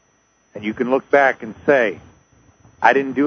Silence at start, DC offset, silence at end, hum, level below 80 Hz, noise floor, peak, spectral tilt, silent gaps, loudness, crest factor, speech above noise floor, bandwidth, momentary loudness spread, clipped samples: 0.55 s; under 0.1%; 0 s; none; -58 dBFS; -60 dBFS; 0 dBFS; -6 dB/octave; none; -18 LUFS; 20 dB; 43 dB; 6.6 kHz; 12 LU; under 0.1%